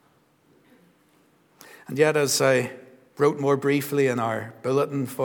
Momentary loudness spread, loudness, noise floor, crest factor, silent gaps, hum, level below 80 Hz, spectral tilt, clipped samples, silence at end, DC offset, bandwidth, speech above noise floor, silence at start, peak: 8 LU; -23 LUFS; -62 dBFS; 20 dB; none; none; -76 dBFS; -4.5 dB/octave; under 0.1%; 0 s; under 0.1%; 20 kHz; 39 dB; 1.9 s; -6 dBFS